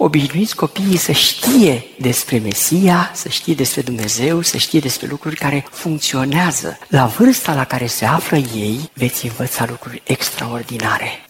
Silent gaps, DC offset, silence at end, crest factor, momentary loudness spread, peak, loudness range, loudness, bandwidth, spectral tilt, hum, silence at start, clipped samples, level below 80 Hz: none; under 0.1%; 0.05 s; 16 dB; 9 LU; 0 dBFS; 4 LU; -16 LUFS; 16.5 kHz; -4 dB/octave; none; 0 s; under 0.1%; -50 dBFS